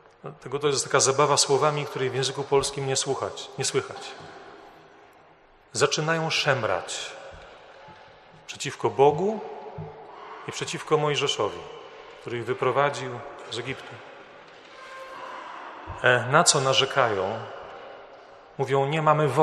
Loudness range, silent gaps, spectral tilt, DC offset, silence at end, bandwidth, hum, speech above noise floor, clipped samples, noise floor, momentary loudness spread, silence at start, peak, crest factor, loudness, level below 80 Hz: 7 LU; none; -3 dB/octave; under 0.1%; 0 s; 13 kHz; none; 31 dB; under 0.1%; -55 dBFS; 22 LU; 0.25 s; -2 dBFS; 24 dB; -24 LUFS; -62 dBFS